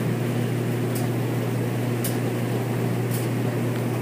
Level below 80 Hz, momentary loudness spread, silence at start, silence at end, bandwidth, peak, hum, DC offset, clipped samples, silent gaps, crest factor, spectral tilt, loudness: -58 dBFS; 1 LU; 0 s; 0 s; 15.5 kHz; -12 dBFS; none; under 0.1%; under 0.1%; none; 12 dB; -6.5 dB/octave; -25 LUFS